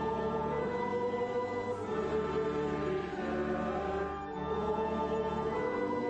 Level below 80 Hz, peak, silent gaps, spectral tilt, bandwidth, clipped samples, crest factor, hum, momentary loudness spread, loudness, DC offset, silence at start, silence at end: -54 dBFS; -22 dBFS; none; -7 dB/octave; 8.4 kHz; under 0.1%; 12 dB; none; 3 LU; -34 LUFS; under 0.1%; 0 s; 0 s